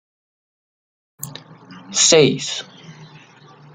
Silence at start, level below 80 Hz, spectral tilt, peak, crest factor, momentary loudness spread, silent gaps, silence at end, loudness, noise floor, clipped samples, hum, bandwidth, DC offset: 1.2 s; -64 dBFS; -2.5 dB/octave; -2 dBFS; 20 dB; 25 LU; none; 0.7 s; -15 LUFS; -46 dBFS; under 0.1%; none; 13.5 kHz; under 0.1%